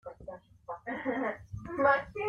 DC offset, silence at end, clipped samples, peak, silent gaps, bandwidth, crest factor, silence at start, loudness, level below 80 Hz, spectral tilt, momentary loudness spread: under 0.1%; 0 s; under 0.1%; -14 dBFS; none; 6.8 kHz; 20 dB; 0.05 s; -32 LUFS; -58 dBFS; -7.5 dB/octave; 21 LU